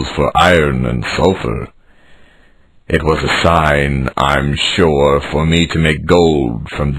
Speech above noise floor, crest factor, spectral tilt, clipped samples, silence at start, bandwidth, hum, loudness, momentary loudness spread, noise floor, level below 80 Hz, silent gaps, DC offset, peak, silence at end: 33 dB; 14 dB; -5.5 dB/octave; under 0.1%; 0 s; 13.5 kHz; none; -13 LUFS; 8 LU; -46 dBFS; -28 dBFS; none; under 0.1%; 0 dBFS; 0 s